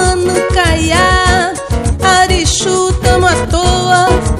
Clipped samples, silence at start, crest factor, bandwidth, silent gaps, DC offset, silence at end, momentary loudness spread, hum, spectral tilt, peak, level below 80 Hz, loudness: 0.1%; 0 s; 10 dB; 14.5 kHz; none; under 0.1%; 0 s; 4 LU; none; -4 dB/octave; 0 dBFS; -18 dBFS; -11 LUFS